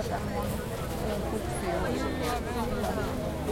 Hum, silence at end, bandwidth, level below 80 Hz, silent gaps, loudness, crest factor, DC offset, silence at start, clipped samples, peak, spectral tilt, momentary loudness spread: none; 0 s; 16.5 kHz; -40 dBFS; none; -32 LUFS; 14 dB; under 0.1%; 0 s; under 0.1%; -16 dBFS; -5.5 dB/octave; 3 LU